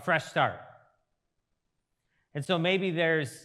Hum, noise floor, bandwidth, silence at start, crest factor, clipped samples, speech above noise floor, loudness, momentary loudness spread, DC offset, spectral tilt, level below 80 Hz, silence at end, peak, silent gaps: none; -80 dBFS; 13 kHz; 0 s; 20 dB; under 0.1%; 52 dB; -28 LUFS; 14 LU; under 0.1%; -5.5 dB/octave; -80 dBFS; 0.05 s; -10 dBFS; none